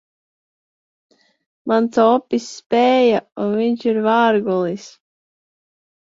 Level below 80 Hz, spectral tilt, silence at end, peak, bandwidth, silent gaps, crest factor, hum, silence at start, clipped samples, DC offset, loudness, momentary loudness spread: -66 dBFS; -5.5 dB/octave; 1.25 s; -2 dBFS; 7.8 kHz; 2.66-2.70 s; 16 dB; none; 1.65 s; under 0.1%; under 0.1%; -17 LUFS; 10 LU